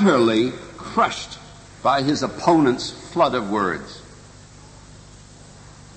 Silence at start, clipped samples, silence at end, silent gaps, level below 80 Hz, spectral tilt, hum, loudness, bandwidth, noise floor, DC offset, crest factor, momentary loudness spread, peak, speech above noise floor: 0 s; under 0.1%; 0.25 s; none; -50 dBFS; -5.5 dB/octave; 50 Hz at -45 dBFS; -21 LUFS; 8.8 kHz; -44 dBFS; under 0.1%; 18 dB; 18 LU; -4 dBFS; 24 dB